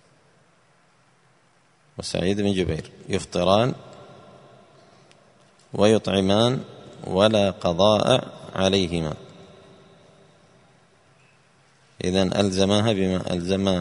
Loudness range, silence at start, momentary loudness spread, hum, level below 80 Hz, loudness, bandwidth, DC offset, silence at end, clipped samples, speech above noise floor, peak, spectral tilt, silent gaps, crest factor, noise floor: 8 LU; 2 s; 14 LU; none; -52 dBFS; -22 LUFS; 11 kHz; under 0.1%; 0 s; under 0.1%; 39 dB; -2 dBFS; -5.5 dB/octave; none; 22 dB; -61 dBFS